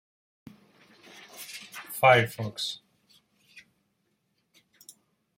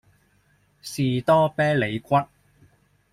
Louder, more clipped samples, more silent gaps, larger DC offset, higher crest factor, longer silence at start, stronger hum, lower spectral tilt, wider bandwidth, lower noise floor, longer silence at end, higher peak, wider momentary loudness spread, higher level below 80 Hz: second, -25 LUFS vs -22 LUFS; neither; neither; neither; first, 26 dB vs 18 dB; first, 1.35 s vs 0.85 s; neither; second, -4 dB/octave vs -6.5 dB/octave; about the same, 16.5 kHz vs 15.5 kHz; first, -75 dBFS vs -63 dBFS; first, 2.6 s vs 0.85 s; about the same, -6 dBFS vs -8 dBFS; first, 24 LU vs 17 LU; second, -72 dBFS vs -60 dBFS